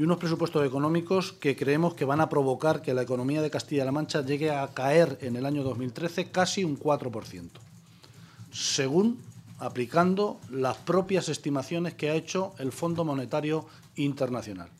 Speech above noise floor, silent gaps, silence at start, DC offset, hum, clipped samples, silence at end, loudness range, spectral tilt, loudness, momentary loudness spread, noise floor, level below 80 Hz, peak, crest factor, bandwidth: 25 dB; none; 0 s; under 0.1%; none; under 0.1%; 0.1 s; 4 LU; -5.5 dB/octave; -28 LUFS; 9 LU; -53 dBFS; -68 dBFS; -8 dBFS; 20 dB; 15 kHz